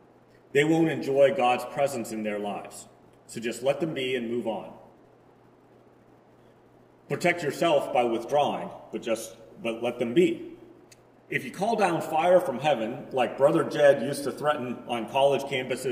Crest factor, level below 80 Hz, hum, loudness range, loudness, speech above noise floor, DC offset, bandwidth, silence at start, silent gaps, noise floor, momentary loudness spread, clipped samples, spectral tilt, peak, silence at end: 20 dB; -70 dBFS; none; 8 LU; -26 LUFS; 31 dB; under 0.1%; 16 kHz; 0.55 s; none; -57 dBFS; 14 LU; under 0.1%; -5 dB/octave; -6 dBFS; 0 s